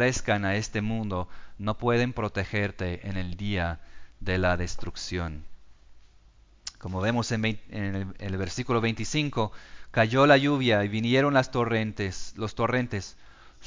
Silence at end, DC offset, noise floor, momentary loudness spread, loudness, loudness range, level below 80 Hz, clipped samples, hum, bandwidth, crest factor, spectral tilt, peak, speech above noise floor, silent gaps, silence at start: 0 s; under 0.1%; -56 dBFS; 13 LU; -27 LUFS; 8 LU; -44 dBFS; under 0.1%; none; 7.6 kHz; 22 dB; -5.5 dB/octave; -6 dBFS; 29 dB; none; 0 s